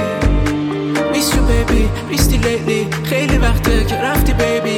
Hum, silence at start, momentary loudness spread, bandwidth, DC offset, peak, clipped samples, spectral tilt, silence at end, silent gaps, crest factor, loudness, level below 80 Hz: none; 0 s; 3 LU; 17.5 kHz; under 0.1%; -2 dBFS; under 0.1%; -5 dB/octave; 0 s; none; 14 dB; -16 LUFS; -18 dBFS